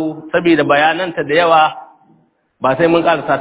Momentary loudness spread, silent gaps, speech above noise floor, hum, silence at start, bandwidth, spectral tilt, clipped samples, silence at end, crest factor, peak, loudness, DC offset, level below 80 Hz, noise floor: 8 LU; none; 42 dB; none; 0 s; 4 kHz; -9 dB/octave; under 0.1%; 0 s; 14 dB; 0 dBFS; -13 LUFS; under 0.1%; -52 dBFS; -55 dBFS